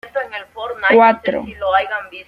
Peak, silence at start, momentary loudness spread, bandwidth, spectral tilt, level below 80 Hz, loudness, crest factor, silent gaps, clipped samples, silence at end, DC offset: -2 dBFS; 0.05 s; 16 LU; 5.6 kHz; -6 dB/octave; -52 dBFS; -16 LUFS; 16 dB; none; under 0.1%; 0.05 s; under 0.1%